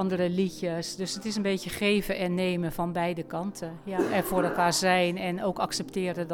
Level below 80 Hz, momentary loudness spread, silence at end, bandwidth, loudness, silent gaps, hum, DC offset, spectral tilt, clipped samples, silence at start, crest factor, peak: -54 dBFS; 8 LU; 0 s; 18.5 kHz; -28 LUFS; none; none; under 0.1%; -4.5 dB/octave; under 0.1%; 0 s; 16 dB; -12 dBFS